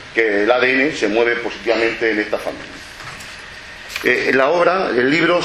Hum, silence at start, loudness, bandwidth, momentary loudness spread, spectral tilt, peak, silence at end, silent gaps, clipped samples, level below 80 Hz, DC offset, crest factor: none; 0 s; -16 LUFS; 13.5 kHz; 18 LU; -4.5 dB/octave; 0 dBFS; 0 s; none; under 0.1%; -50 dBFS; under 0.1%; 18 dB